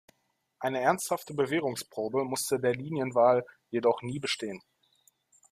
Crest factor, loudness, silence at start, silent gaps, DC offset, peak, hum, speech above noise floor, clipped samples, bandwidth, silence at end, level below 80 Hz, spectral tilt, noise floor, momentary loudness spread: 20 dB; -30 LUFS; 0.6 s; none; under 0.1%; -10 dBFS; none; 47 dB; under 0.1%; 15.5 kHz; 0.95 s; -72 dBFS; -4.5 dB/octave; -76 dBFS; 10 LU